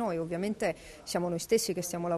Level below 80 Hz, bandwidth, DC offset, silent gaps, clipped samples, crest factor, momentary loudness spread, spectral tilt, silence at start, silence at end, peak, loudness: -60 dBFS; 13.5 kHz; under 0.1%; none; under 0.1%; 16 dB; 6 LU; -4.5 dB/octave; 0 s; 0 s; -16 dBFS; -32 LUFS